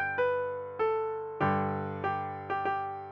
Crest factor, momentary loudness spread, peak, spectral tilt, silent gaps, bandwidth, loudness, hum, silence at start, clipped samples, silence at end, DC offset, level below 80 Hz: 16 dB; 6 LU; -16 dBFS; -8.5 dB/octave; none; 6.2 kHz; -32 LUFS; none; 0 s; under 0.1%; 0 s; under 0.1%; -70 dBFS